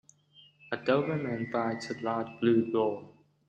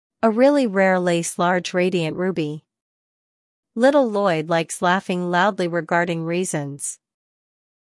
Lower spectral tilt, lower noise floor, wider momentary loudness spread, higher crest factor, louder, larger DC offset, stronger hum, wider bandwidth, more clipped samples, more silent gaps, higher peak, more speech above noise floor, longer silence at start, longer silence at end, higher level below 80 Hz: first, -7 dB/octave vs -5 dB/octave; second, -61 dBFS vs under -90 dBFS; second, 8 LU vs 11 LU; about the same, 20 dB vs 18 dB; second, -30 LUFS vs -20 LUFS; neither; neither; second, 8.8 kHz vs 12 kHz; neither; second, none vs 2.81-3.63 s; second, -12 dBFS vs -4 dBFS; second, 31 dB vs over 70 dB; first, 0.65 s vs 0.25 s; second, 0.4 s vs 1.05 s; about the same, -74 dBFS vs -70 dBFS